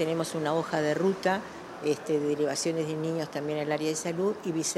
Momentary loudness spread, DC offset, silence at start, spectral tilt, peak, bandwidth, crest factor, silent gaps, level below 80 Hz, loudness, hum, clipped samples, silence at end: 5 LU; under 0.1%; 0 s; -4.5 dB/octave; -12 dBFS; 14 kHz; 16 dB; none; -70 dBFS; -29 LUFS; none; under 0.1%; 0 s